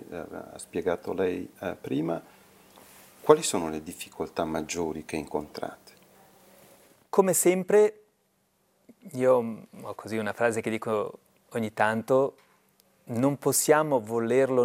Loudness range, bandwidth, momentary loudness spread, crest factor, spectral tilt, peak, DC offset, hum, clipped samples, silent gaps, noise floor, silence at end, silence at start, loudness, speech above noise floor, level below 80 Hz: 7 LU; 17 kHz; 16 LU; 26 dB; -4.5 dB/octave; -2 dBFS; under 0.1%; none; under 0.1%; none; -70 dBFS; 0 s; 0 s; -27 LUFS; 44 dB; -68 dBFS